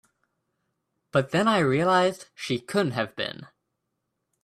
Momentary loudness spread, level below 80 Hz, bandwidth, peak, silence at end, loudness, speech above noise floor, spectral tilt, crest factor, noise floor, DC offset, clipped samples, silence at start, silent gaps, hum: 12 LU; -66 dBFS; 14 kHz; -8 dBFS; 1 s; -25 LUFS; 55 dB; -5.5 dB/octave; 18 dB; -80 dBFS; under 0.1%; under 0.1%; 1.15 s; none; none